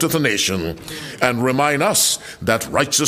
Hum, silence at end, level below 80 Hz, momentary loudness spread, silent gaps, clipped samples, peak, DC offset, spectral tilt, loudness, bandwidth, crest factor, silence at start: none; 0 s; -48 dBFS; 11 LU; none; under 0.1%; 0 dBFS; under 0.1%; -3 dB/octave; -18 LUFS; 16 kHz; 18 dB; 0 s